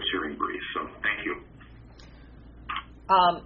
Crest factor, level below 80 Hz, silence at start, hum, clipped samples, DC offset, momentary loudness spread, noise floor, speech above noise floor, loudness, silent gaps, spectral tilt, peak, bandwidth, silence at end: 22 dB; -52 dBFS; 0 s; none; under 0.1%; under 0.1%; 26 LU; -49 dBFS; 23 dB; -28 LUFS; none; -1 dB/octave; -8 dBFS; 5.4 kHz; 0 s